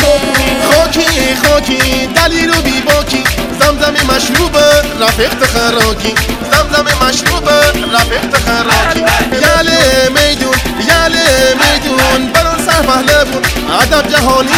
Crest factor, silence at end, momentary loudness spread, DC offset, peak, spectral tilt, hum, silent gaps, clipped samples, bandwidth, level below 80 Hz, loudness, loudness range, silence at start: 10 dB; 0 s; 3 LU; under 0.1%; 0 dBFS; -3 dB/octave; none; none; 1%; over 20 kHz; -22 dBFS; -9 LUFS; 1 LU; 0 s